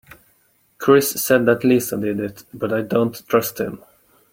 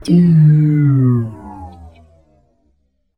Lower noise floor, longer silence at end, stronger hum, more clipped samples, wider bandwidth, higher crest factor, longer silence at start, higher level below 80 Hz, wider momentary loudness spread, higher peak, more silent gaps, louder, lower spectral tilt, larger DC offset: about the same, -60 dBFS vs -62 dBFS; second, 0.55 s vs 1.3 s; neither; neither; first, 17 kHz vs 9.4 kHz; first, 20 dB vs 14 dB; first, 0.8 s vs 0.05 s; second, -58 dBFS vs -46 dBFS; second, 13 LU vs 24 LU; about the same, 0 dBFS vs -2 dBFS; neither; second, -19 LUFS vs -12 LUFS; second, -5 dB/octave vs -10 dB/octave; neither